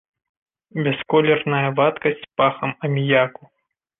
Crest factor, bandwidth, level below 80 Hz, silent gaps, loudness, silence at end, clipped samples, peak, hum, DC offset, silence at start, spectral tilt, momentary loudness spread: 18 dB; 3.9 kHz; -62 dBFS; none; -20 LUFS; 0.7 s; under 0.1%; -4 dBFS; none; under 0.1%; 0.75 s; -9.5 dB/octave; 8 LU